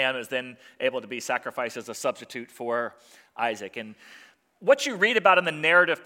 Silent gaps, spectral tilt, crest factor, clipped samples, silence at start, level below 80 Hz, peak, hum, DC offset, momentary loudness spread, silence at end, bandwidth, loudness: none; -3 dB/octave; 22 dB; under 0.1%; 0 s; -82 dBFS; -4 dBFS; none; under 0.1%; 18 LU; 0.05 s; 16.5 kHz; -25 LUFS